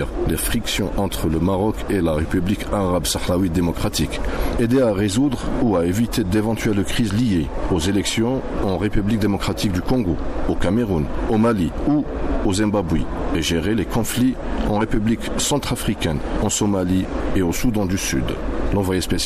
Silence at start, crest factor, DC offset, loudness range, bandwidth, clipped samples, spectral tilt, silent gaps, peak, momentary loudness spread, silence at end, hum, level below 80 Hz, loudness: 0 s; 14 dB; under 0.1%; 1 LU; 15 kHz; under 0.1%; -5.5 dB/octave; none; -6 dBFS; 4 LU; 0 s; none; -28 dBFS; -21 LUFS